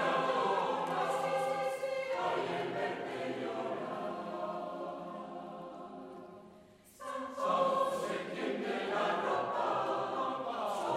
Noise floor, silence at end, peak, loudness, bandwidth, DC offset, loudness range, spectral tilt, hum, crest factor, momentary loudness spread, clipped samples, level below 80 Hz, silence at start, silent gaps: -59 dBFS; 0 s; -20 dBFS; -35 LUFS; 15 kHz; under 0.1%; 9 LU; -4.5 dB/octave; none; 16 dB; 14 LU; under 0.1%; -78 dBFS; 0 s; none